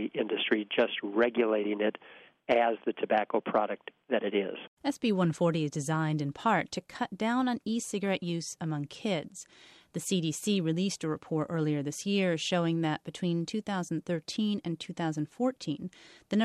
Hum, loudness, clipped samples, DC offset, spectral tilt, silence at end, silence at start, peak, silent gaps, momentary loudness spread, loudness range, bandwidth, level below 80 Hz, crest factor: none; -31 LUFS; under 0.1%; under 0.1%; -5.5 dB/octave; 0 s; 0 s; -14 dBFS; 4.68-4.77 s; 8 LU; 4 LU; 13 kHz; -72 dBFS; 18 dB